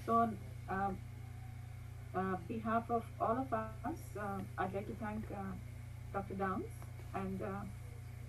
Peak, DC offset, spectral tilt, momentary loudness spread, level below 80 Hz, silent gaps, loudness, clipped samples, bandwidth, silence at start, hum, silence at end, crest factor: -22 dBFS; under 0.1%; -7.5 dB/octave; 13 LU; -56 dBFS; none; -41 LUFS; under 0.1%; 16 kHz; 0 s; 60 Hz at -50 dBFS; 0 s; 20 dB